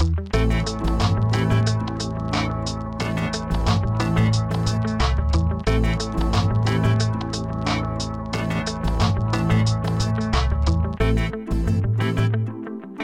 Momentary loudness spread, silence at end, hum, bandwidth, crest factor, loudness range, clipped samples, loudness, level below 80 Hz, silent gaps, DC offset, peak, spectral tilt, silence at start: 6 LU; 0 s; none; 10.5 kHz; 14 dB; 2 LU; under 0.1%; -22 LUFS; -28 dBFS; none; under 0.1%; -6 dBFS; -6 dB/octave; 0 s